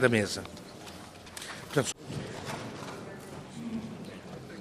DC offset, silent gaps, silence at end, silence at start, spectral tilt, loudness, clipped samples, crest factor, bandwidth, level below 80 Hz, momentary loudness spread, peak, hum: under 0.1%; none; 0 s; 0 s; -4.5 dB/octave; -36 LUFS; under 0.1%; 26 dB; 15 kHz; -64 dBFS; 14 LU; -10 dBFS; none